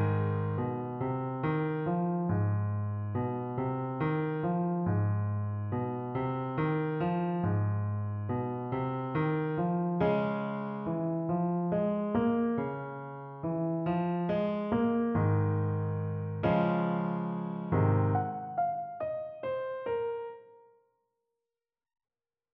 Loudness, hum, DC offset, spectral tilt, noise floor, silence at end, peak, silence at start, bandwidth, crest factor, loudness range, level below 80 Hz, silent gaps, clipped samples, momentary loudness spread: -32 LUFS; none; under 0.1%; -8.5 dB/octave; under -90 dBFS; 1.95 s; -14 dBFS; 0 s; 4.1 kHz; 18 dB; 2 LU; -60 dBFS; none; under 0.1%; 7 LU